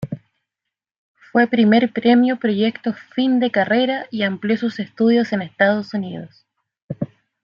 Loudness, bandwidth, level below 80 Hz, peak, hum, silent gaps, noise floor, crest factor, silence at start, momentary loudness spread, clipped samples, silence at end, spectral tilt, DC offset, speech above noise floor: -18 LUFS; 6.8 kHz; -64 dBFS; -2 dBFS; none; 0.98-1.14 s, 6.82-6.89 s; -83 dBFS; 16 dB; 0 s; 15 LU; under 0.1%; 0.4 s; -7.5 dB/octave; under 0.1%; 66 dB